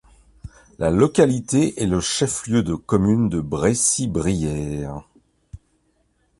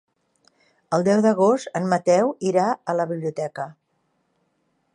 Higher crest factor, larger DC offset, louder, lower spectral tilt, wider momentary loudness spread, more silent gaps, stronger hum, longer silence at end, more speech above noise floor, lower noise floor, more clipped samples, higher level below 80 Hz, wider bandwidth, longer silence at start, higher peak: about the same, 18 dB vs 18 dB; neither; about the same, -20 LUFS vs -21 LUFS; second, -5 dB/octave vs -6.5 dB/octave; about the same, 9 LU vs 11 LU; neither; neither; second, 0.85 s vs 1.25 s; second, 45 dB vs 49 dB; second, -65 dBFS vs -70 dBFS; neither; first, -40 dBFS vs -72 dBFS; about the same, 11.5 kHz vs 11 kHz; second, 0.45 s vs 0.9 s; about the same, -2 dBFS vs -4 dBFS